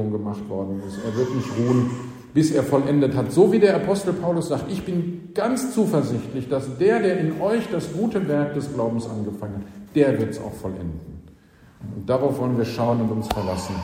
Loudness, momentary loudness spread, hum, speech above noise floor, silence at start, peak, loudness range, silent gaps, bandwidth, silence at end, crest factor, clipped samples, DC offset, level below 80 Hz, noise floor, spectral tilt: -23 LUFS; 12 LU; none; 29 dB; 0 s; -4 dBFS; 6 LU; none; 16 kHz; 0 s; 18 dB; under 0.1%; under 0.1%; -50 dBFS; -51 dBFS; -7 dB/octave